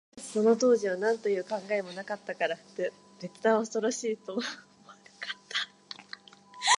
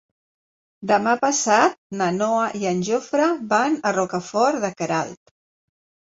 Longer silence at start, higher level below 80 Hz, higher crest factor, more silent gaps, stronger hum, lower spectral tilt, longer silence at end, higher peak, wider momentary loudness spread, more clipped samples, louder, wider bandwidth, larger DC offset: second, 0.15 s vs 0.8 s; second, -82 dBFS vs -66 dBFS; about the same, 20 dB vs 18 dB; second, none vs 1.78-1.90 s; neither; second, -2.5 dB/octave vs -4 dB/octave; second, 0.05 s vs 0.9 s; second, -10 dBFS vs -4 dBFS; first, 18 LU vs 7 LU; neither; second, -30 LUFS vs -21 LUFS; first, 11.5 kHz vs 8 kHz; neither